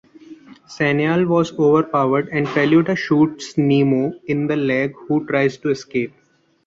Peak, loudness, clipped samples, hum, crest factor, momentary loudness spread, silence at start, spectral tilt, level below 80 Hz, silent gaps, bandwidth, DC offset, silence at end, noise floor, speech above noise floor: -4 dBFS; -18 LUFS; under 0.1%; none; 14 dB; 7 LU; 0.3 s; -7 dB/octave; -58 dBFS; none; 7.8 kHz; under 0.1%; 0.6 s; -42 dBFS; 24 dB